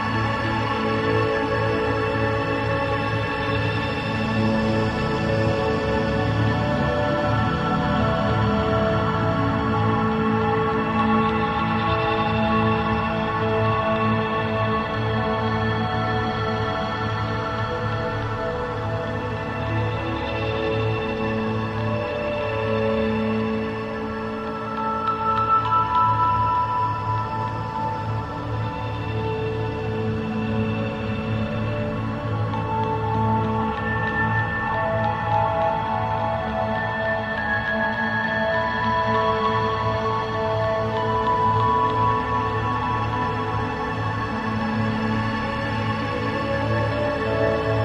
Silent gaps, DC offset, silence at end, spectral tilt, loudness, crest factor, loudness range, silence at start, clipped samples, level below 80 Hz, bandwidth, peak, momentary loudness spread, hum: none; under 0.1%; 0 s; -7.5 dB/octave; -23 LUFS; 14 dB; 4 LU; 0 s; under 0.1%; -40 dBFS; 8 kHz; -8 dBFS; 6 LU; none